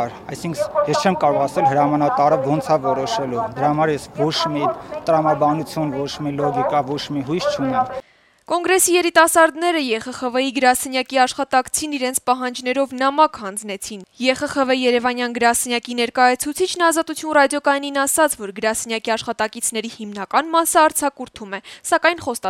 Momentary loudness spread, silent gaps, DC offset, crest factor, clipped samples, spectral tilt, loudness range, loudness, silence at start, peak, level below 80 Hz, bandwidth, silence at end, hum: 9 LU; none; under 0.1%; 18 dB; under 0.1%; -3.5 dB/octave; 3 LU; -19 LUFS; 0 s; -2 dBFS; -56 dBFS; 16.5 kHz; 0 s; none